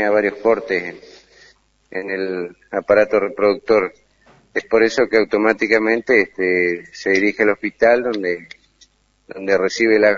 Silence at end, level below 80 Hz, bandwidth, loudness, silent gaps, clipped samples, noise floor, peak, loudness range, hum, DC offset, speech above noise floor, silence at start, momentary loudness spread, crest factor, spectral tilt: 0 s; -58 dBFS; 7.4 kHz; -17 LUFS; none; under 0.1%; -55 dBFS; 0 dBFS; 4 LU; none; under 0.1%; 38 dB; 0 s; 11 LU; 18 dB; -5 dB/octave